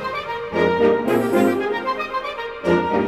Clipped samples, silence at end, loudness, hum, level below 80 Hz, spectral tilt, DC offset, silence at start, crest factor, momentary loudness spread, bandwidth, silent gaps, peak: under 0.1%; 0 s; -20 LUFS; none; -50 dBFS; -6 dB/octave; under 0.1%; 0 s; 16 dB; 9 LU; 15.5 kHz; none; -4 dBFS